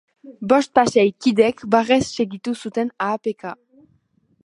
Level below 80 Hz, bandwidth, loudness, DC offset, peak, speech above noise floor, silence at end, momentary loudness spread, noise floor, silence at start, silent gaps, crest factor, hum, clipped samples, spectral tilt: -58 dBFS; 11.5 kHz; -19 LUFS; under 0.1%; -2 dBFS; 43 dB; 0.9 s; 12 LU; -62 dBFS; 0.25 s; none; 20 dB; none; under 0.1%; -5 dB/octave